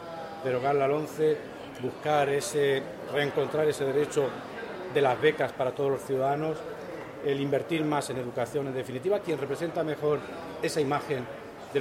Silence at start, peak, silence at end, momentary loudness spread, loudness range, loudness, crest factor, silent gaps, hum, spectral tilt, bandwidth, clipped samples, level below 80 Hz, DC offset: 0 s; -10 dBFS; 0 s; 11 LU; 3 LU; -29 LUFS; 18 dB; none; none; -5.5 dB/octave; 16 kHz; under 0.1%; -66 dBFS; under 0.1%